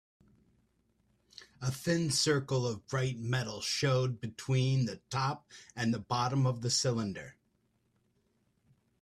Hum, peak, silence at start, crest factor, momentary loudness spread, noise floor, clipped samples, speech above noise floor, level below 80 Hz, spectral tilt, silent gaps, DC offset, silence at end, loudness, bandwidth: none; -16 dBFS; 1.4 s; 18 dB; 10 LU; -75 dBFS; under 0.1%; 43 dB; -66 dBFS; -4.5 dB/octave; none; under 0.1%; 1.7 s; -32 LUFS; 13.5 kHz